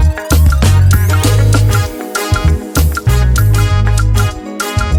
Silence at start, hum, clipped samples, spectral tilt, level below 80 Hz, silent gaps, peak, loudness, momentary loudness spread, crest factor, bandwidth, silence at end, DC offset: 0 s; none; under 0.1%; -5.5 dB/octave; -14 dBFS; none; 0 dBFS; -12 LUFS; 7 LU; 10 dB; 17.5 kHz; 0 s; under 0.1%